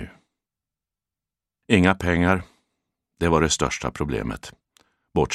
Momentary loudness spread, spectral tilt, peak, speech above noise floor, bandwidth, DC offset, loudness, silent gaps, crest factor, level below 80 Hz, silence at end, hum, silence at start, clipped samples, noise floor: 14 LU; -5 dB/octave; 0 dBFS; 68 dB; 13.5 kHz; under 0.1%; -22 LUFS; none; 24 dB; -42 dBFS; 0 s; none; 0 s; under 0.1%; -89 dBFS